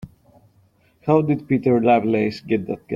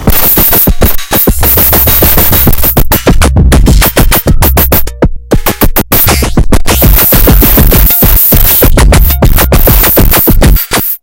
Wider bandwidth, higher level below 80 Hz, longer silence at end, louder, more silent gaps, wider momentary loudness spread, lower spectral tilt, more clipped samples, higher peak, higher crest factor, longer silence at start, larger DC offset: second, 7.2 kHz vs over 20 kHz; second, -54 dBFS vs -8 dBFS; about the same, 0 s vs 0.05 s; second, -20 LUFS vs -5 LUFS; neither; about the same, 8 LU vs 6 LU; first, -9 dB/octave vs -4.5 dB/octave; second, under 0.1% vs 10%; about the same, -2 dBFS vs 0 dBFS; first, 18 dB vs 4 dB; about the same, 0 s vs 0 s; neither